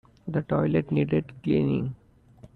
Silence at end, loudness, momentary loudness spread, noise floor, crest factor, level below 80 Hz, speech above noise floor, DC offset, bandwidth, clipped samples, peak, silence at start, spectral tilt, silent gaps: 0.1 s; -26 LUFS; 7 LU; -53 dBFS; 16 dB; -54 dBFS; 27 dB; under 0.1%; 4.5 kHz; under 0.1%; -10 dBFS; 0.25 s; -10.5 dB/octave; none